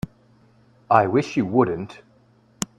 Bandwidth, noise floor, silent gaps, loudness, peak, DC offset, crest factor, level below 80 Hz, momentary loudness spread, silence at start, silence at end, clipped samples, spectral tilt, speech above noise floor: 15 kHz; -57 dBFS; none; -21 LUFS; -2 dBFS; under 0.1%; 22 dB; -56 dBFS; 17 LU; 0.05 s; 0.15 s; under 0.1%; -6 dB/octave; 37 dB